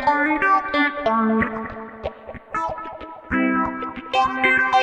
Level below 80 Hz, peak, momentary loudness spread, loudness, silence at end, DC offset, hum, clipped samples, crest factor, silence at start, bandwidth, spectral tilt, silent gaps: -48 dBFS; -4 dBFS; 16 LU; -20 LUFS; 0 s; under 0.1%; none; under 0.1%; 16 dB; 0 s; 9 kHz; -5.5 dB/octave; none